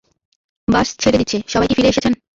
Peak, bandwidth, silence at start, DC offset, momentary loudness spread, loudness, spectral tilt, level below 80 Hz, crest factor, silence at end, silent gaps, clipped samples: -2 dBFS; 7.8 kHz; 0.7 s; under 0.1%; 4 LU; -16 LUFS; -4.5 dB/octave; -38 dBFS; 16 dB; 0.2 s; none; under 0.1%